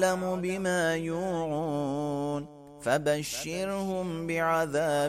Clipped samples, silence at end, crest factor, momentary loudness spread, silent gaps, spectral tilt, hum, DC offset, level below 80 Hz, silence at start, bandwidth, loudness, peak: under 0.1%; 0 s; 16 dB; 6 LU; none; -5 dB/octave; none; under 0.1%; -58 dBFS; 0 s; 16 kHz; -30 LUFS; -14 dBFS